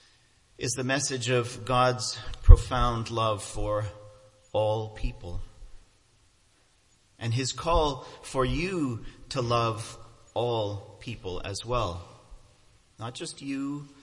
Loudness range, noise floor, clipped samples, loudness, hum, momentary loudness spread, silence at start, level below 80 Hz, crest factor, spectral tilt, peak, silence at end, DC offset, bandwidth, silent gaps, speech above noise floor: 10 LU; -64 dBFS; under 0.1%; -29 LUFS; none; 15 LU; 0.6 s; -30 dBFS; 28 dB; -5 dB/octave; 0 dBFS; 0.15 s; under 0.1%; 11.5 kHz; none; 39 dB